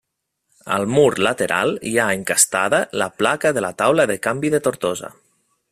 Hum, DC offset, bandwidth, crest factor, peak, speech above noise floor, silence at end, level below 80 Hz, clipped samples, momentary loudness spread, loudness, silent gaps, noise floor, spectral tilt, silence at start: none; under 0.1%; 16 kHz; 20 dB; 0 dBFS; 56 dB; 0.6 s; -58 dBFS; under 0.1%; 8 LU; -18 LUFS; none; -75 dBFS; -3.5 dB/octave; 0.65 s